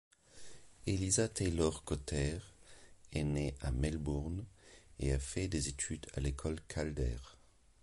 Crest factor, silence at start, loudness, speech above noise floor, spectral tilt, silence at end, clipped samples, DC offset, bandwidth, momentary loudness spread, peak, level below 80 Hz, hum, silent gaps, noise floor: 20 dB; 0.35 s; -38 LUFS; 22 dB; -5 dB/octave; 0.5 s; under 0.1%; under 0.1%; 11.5 kHz; 21 LU; -18 dBFS; -44 dBFS; none; none; -58 dBFS